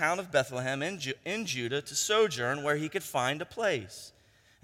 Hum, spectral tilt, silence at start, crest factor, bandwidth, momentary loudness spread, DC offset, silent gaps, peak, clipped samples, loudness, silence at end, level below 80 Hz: none; -3 dB/octave; 0 s; 20 dB; 16.5 kHz; 9 LU; under 0.1%; none; -12 dBFS; under 0.1%; -31 LUFS; 0.55 s; -70 dBFS